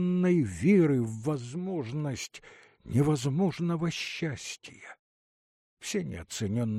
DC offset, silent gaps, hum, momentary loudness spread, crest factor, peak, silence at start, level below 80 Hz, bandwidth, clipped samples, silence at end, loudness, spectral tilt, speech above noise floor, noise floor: under 0.1%; 4.99-5.77 s; none; 17 LU; 16 dB; -14 dBFS; 0 s; -60 dBFS; 14 kHz; under 0.1%; 0 s; -29 LUFS; -6.5 dB/octave; over 61 dB; under -90 dBFS